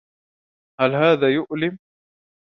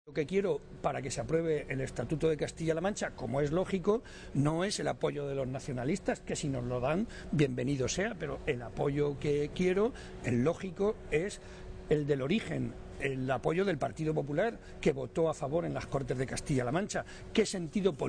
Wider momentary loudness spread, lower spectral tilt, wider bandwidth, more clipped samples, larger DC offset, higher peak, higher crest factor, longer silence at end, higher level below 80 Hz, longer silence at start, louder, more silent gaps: first, 9 LU vs 6 LU; first, -8 dB/octave vs -6 dB/octave; second, 6.2 kHz vs 10 kHz; neither; neither; first, -2 dBFS vs -16 dBFS; about the same, 20 dB vs 16 dB; first, 0.8 s vs 0 s; second, -66 dBFS vs -50 dBFS; first, 0.8 s vs 0.05 s; first, -20 LUFS vs -33 LUFS; neither